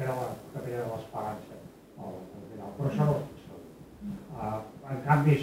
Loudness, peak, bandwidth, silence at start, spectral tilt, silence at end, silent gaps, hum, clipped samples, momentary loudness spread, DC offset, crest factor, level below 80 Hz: -33 LUFS; -10 dBFS; 15.5 kHz; 0 s; -8 dB/octave; 0 s; none; none; under 0.1%; 21 LU; under 0.1%; 22 dB; -60 dBFS